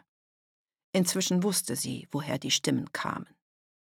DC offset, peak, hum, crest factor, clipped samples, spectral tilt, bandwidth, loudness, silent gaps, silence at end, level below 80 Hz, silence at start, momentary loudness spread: under 0.1%; -14 dBFS; none; 18 dB; under 0.1%; -3.5 dB/octave; 18.5 kHz; -29 LUFS; none; 0.7 s; -72 dBFS; 0.95 s; 8 LU